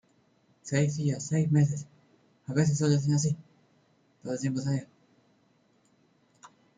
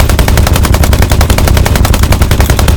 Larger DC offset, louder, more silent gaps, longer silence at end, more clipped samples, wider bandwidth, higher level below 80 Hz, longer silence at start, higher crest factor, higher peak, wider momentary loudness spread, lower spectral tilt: neither; second, -29 LUFS vs -8 LUFS; neither; first, 0.3 s vs 0 s; second, under 0.1% vs 8%; second, 9.4 kHz vs over 20 kHz; second, -66 dBFS vs -10 dBFS; first, 0.65 s vs 0 s; first, 18 dB vs 6 dB; second, -12 dBFS vs 0 dBFS; first, 15 LU vs 1 LU; first, -6.5 dB/octave vs -5 dB/octave